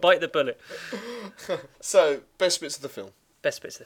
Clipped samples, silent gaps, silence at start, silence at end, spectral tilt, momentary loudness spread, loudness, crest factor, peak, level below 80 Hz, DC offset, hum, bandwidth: under 0.1%; none; 0 s; 0 s; -2 dB/octave; 17 LU; -26 LUFS; 22 dB; -4 dBFS; -70 dBFS; under 0.1%; none; 18 kHz